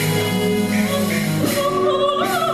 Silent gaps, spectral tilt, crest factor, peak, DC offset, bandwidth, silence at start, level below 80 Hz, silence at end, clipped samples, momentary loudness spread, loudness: none; -5 dB/octave; 12 dB; -6 dBFS; under 0.1%; 14.5 kHz; 0 s; -48 dBFS; 0 s; under 0.1%; 2 LU; -19 LUFS